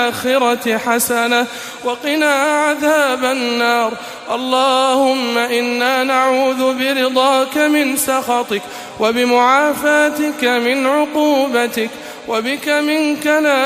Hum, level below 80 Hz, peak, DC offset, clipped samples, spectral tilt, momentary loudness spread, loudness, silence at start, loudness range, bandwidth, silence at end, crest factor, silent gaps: none; -60 dBFS; -2 dBFS; under 0.1%; under 0.1%; -2 dB/octave; 8 LU; -15 LUFS; 0 s; 1 LU; 15.5 kHz; 0 s; 14 dB; none